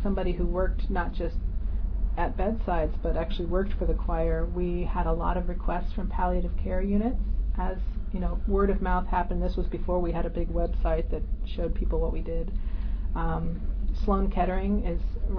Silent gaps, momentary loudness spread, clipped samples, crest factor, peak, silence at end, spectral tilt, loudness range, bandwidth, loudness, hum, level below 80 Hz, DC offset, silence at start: none; 6 LU; under 0.1%; 14 dB; -12 dBFS; 0 s; -10 dB/octave; 2 LU; 5.2 kHz; -30 LUFS; none; -28 dBFS; under 0.1%; 0 s